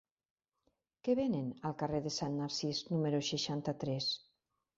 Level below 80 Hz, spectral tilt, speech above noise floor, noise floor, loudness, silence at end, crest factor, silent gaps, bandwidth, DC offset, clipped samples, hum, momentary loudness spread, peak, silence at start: -70 dBFS; -5.5 dB/octave; 46 dB; -82 dBFS; -37 LUFS; 0.6 s; 18 dB; none; 7.6 kHz; under 0.1%; under 0.1%; none; 5 LU; -20 dBFS; 1.05 s